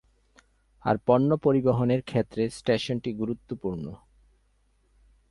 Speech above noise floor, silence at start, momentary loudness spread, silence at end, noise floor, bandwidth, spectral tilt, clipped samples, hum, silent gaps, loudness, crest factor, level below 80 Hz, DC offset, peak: 41 dB; 0.85 s; 11 LU; 1.35 s; -67 dBFS; 11.5 kHz; -7.5 dB/octave; under 0.1%; none; none; -26 LUFS; 20 dB; -56 dBFS; under 0.1%; -8 dBFS